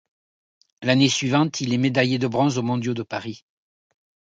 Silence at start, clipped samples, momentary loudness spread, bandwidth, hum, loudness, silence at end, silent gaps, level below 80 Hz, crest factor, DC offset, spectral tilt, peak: 0.8 s; under 0.1%; 12 LU; 9.2 kHz; none; -22 LUFS; 1 s; none; -64 dBFS; 18 dB; under 0.1%; -5 dB/octave; -6 dBFS